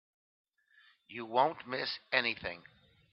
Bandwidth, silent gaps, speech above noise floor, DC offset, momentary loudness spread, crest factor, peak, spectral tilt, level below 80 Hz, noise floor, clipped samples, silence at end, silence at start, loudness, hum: 6 kHz; none; 32 dB; under 0.1%; 15 LU; 28 dB; -10 dBFS; -6 dB/octave; -72 dBFS; -67 dBFS; under 0.1%; 0.5 s; 1.1 s; -33 LUFS; none